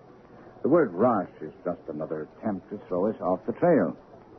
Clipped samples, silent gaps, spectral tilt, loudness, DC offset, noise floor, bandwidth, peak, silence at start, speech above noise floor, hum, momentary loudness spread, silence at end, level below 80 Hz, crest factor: under 0.1%; none; -11 dB/octave; -27 LUFS; under 0.1%; -50 dBFS; 5.2 kHz; -10 dBFS; 0.4 s; 23 dB; none; 12 LU; 0 s; -64 dBFS; 18 dB